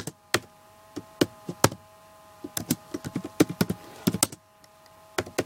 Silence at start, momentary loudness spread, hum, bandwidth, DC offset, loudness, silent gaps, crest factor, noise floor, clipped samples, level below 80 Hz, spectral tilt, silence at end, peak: 0 s; 18 LU; none; 17 kHz; under 0.1%; -28 LUFS; none; 30 dB; -56 dBFS; under 0.1%; -58 dBFS; -4 dB/octave; 0 s; 0 dBFS